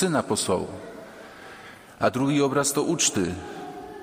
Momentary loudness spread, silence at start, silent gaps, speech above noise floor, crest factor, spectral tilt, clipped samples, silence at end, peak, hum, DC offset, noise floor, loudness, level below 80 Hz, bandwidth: 21 LU; 0 s; none; 21 dB; 18 dB; -4 dB/octave; under 0.1%; 0 s; -8 dBFS; none; under 0.1%; -45 dBFS; -24 LUFS; -58 dBFS; 15.5 kHz